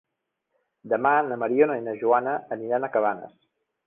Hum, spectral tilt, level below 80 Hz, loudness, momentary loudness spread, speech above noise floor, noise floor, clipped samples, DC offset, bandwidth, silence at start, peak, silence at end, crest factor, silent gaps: none; -9.5 dB/octave; -70 dBFS; -24 LUFS; 7 LU; 56 dB; -80 dBFS; under 0.1%; under 0.1%; 3.6 kHz; 0.85 s; -6 dBFS; 0.6 s; 20 dB; none